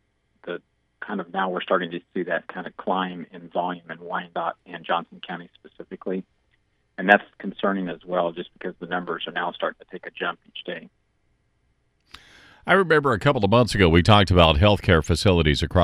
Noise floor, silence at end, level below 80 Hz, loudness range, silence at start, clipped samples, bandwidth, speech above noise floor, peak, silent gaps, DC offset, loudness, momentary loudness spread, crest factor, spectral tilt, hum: -68 dBFS; 0 s; -38 dBFS; 13 LU; 0.45 s; under 0.1%; 12.5 kHz; 45 dB; 0 dBFS; none; under 0.1%; -22 LUFS; 19 LU; 24 dB; -6 dB/octave; none